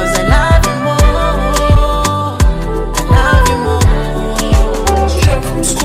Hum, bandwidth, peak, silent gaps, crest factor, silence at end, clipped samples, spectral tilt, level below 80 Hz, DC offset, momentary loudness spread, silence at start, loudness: none; 16 kHz; 0 dBFS; none; 10 dB; 0 s; under 0.1%; -5 dB/octave; -14 dBFS; under 0.1%; 6 LU; 0 s; -12 LUFS